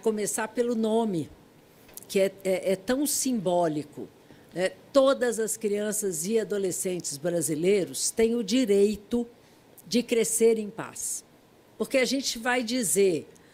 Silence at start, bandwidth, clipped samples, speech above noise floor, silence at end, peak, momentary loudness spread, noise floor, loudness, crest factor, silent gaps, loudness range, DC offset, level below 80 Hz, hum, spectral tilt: 0.05 s; 16 kHz; under 0.1%; 31 dB; 0.3 s; -8 dBFS; 11 LU; -57 dBFS; -26 LUFS; 18 dB; none; 2 LU; under 0.1%; -62 dBFS; none; -3.5 dB/octave